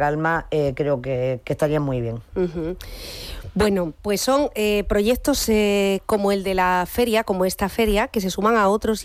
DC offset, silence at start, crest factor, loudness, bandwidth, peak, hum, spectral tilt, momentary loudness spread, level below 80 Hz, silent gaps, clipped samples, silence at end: under 0.1%; 0 s; 12 dB; -21 LUFS; 16 kHz; -8 dBFS; none; -5 dB/octave; 9 LU; -38 dBFS; none; under 0.1%; 0 s